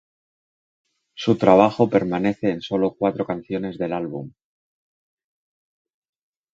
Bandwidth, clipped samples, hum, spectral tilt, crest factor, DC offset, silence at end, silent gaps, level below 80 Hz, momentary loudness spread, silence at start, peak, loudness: 7.8 kHz; under 0.1%; none; -7.5 dB/octave; 22 dB; under 0.1%; 2.25 s; none; -58 dBFS; 13 LU; 1.15 s; 0 dBFS; -21 LUFS